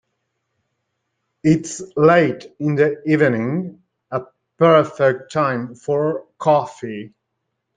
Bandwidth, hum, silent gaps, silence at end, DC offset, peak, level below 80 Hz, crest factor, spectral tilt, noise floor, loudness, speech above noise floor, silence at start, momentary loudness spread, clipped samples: 9.4 kHz; none; none; 0.7 s; under 0.1%; -2 dBFS; -60 dBFS; 18 dB; -6.5 dB/octave; -76 dBFS; -18 LUFS; 58 dB; 1.45 s; 14 LU; under 0.1%